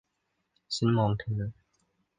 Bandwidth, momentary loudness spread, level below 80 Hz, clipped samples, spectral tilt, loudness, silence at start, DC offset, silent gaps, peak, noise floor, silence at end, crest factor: 9.6 kHz; 10 LU; -56 dBFS; under 0.1%; -6.5 dB/octave; -30 LUFS; 0.7 s; under 0.1%; none; -14 dBFS; -79 dBFS; 0.65 s; 18 dB